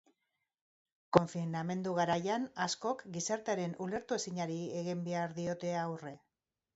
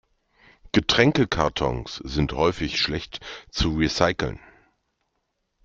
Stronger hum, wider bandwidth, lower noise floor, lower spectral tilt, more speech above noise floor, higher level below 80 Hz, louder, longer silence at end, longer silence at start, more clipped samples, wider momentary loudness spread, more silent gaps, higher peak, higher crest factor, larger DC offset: neither; about the same, 8 kHz vs 7.6 kHz; first, -88 dBFS vs -76 dBFS; about the same, -5 dB/octave vs -5 dB/octave; about the same, 52 dB vs 52 dB; second, -70 dBFS vs -40 dBFS; second, -36 LUFS vs -23 LUFS; second, 0.6 s vs 1.3 s; first, 1.1 s vs 0.65 s; neither; second, 7 LU vs 14 LU; neither; second, -8 dBFS vs -2 dBFS; first, 30 dB vs 22 dB; neither